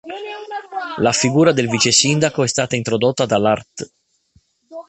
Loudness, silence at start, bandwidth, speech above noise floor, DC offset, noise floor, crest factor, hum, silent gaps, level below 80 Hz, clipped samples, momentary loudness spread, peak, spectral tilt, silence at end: -16 LUFS; 0.05 s; 8.8 kHz; 41 dB; under 0.1%; -58 dBFS; 18 dB; none; none; -54 dBFS; under 0.1%; 17 LU; 0 dBFS; -3.5 dB/octave; 0.05 s